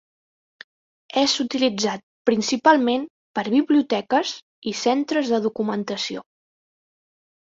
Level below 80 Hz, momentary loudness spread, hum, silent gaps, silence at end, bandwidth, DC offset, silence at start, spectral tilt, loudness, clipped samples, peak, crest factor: -68 dBFS; 11 LU; none; 2.03-2.25 s, 3.10-3.34 s, 4.43-4.62 s; 1.25 s; 7.8 kHz; under 0.1%; 1.15 s; -3.5 dB/octave; -22 LUFS; under 0.1%; -2 dBFS; 20 dB